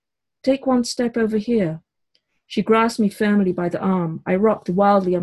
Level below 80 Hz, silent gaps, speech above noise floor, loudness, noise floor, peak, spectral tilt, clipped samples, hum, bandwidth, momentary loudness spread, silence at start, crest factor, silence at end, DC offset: -56 dBFS; none; 50 dB; -20 LUFS; -69 dBFS; -4 dBFS; -6.5 dB/octave; under 0.1%; none; 12 kHz; 8 LU; 0.45 s; 16 dB; 0 s; under 0.1%